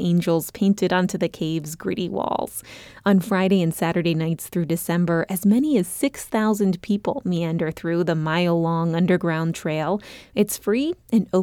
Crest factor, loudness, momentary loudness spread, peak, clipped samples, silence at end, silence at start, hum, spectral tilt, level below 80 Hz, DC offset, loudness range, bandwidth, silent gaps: 14 dB; -22 LUFS; 7 LU; -8 dBFS; under 0.1%; 0 s; 0 s; none; -6 dB/octave; -56 dBFS; under 0.1%; 2 LU; 18 kHz; none